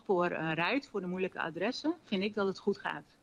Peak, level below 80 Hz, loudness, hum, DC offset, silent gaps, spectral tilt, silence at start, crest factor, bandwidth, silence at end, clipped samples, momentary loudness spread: -18 dBFS; -72 dBFS; -34 LUFS; none; under 0.1%; none; -6 dB/octave; 0.1 s; 16 dB; 10 kHz; 0.2 s; under 0.1%; 5 LU